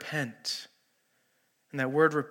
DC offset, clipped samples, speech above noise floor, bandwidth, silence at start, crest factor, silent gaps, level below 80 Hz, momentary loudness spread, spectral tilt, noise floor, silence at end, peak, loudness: under 0.1%; under 0.1%; 44 dB; 17 kHz; 0 s; 22 dB; none; -86 dBFS; 15 LU; -4.5 dB/octave; -73 dBFS; 0 s; -10 dBFS; -30 LUFS